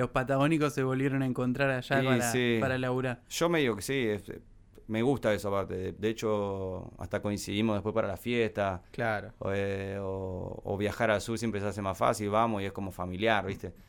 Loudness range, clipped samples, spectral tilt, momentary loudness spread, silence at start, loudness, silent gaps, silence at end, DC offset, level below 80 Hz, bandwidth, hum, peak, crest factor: 4 LU; under 0.1%; -5.5 dB/octave; 9 LU; 0 s; -31 LUFS; none; 0.05 s; under 0.1%; -54 dBFS; 19 kHz; none; -12 dBFS; 20 dB